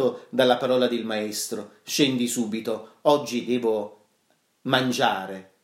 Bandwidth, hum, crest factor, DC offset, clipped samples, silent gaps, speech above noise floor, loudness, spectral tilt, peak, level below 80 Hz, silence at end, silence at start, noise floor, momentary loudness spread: 16 kHz; none; 20 dB; under 0.1%; under 0.1%; none; 43 dB; -24 LUFS; -4 dB/octave; -6 dBFS; -76 dBFS; 0.2 s; 0 s; -68 dBFS; 10 LU